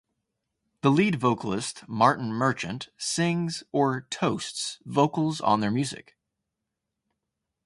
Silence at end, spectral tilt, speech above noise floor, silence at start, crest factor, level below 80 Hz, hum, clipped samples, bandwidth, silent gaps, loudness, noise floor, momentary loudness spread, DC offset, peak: 1.65 s; -5 dB/octave; 58 dB; 0.85 s; 22 dB; -64 dBFS; none; under 0.1%; 11.5 kHz; none; -26 LUFS; -84 dBFS; 10 LU; under 0.1%; -6 dBFS